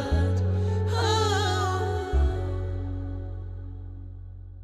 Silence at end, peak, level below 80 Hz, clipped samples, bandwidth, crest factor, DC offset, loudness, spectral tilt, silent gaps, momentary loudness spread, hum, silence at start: 0 s; -12 dBFS; -34 dBFS; under 0.1%; 11.5 kHz; 14 dB; under 0.1%; -27 LUFS; -5.5 dB/octave; none; 17 LU; none; 0 s